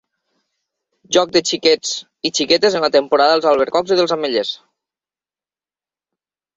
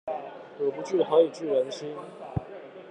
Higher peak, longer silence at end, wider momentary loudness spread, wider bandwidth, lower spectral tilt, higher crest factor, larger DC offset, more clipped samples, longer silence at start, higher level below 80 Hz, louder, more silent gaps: first, 0 dBFS vs -8 dBFS; first, 2 s vs 0 s; second, 8 LU vs 18 LU; second, 8 kHz vs 9.2 kHz; second, -2.5 dB/octave vs -6.5 dB/octave; about the same, 18 dB vs 20 dB; neither; neither; first, 1.1 s vs 0.05 s; about the same, -60 dBFS vs -60 dBFS; first, -16 LUFS vs -28 LUFS; neither